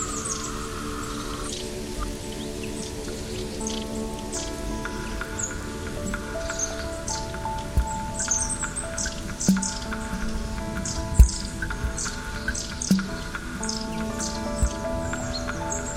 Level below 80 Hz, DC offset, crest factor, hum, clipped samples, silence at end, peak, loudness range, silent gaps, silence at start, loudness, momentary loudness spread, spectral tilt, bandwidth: -32 dBFS; under 0.1%; 26 dB; none; under 0.1%; 0 s; -2 dBFS; 6 LU; none; 0 s; -28 LUFS; 9 LU; -4 dB/octave; 16 kHz